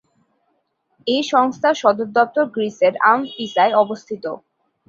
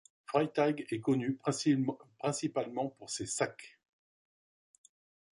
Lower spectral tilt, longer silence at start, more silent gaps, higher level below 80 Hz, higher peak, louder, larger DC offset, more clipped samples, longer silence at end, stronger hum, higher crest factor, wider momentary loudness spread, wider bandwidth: about the same, -4 dB/octave vs -5 dB/octave; first, 1.05 s vs 0.3 s; neither; first, -68 dBFS vs -76 dBFS; first, -2 dBFS vs -16 dBFS; first, -18 LUFS vs -34 LUFS; neither; neither; second, 0.5 s vs 1.65 s; neither; about the same, 18 dB vs 20 dB; first, 13 LU vs 8 LU; second, 7.6 kHz vs 11.5 kHz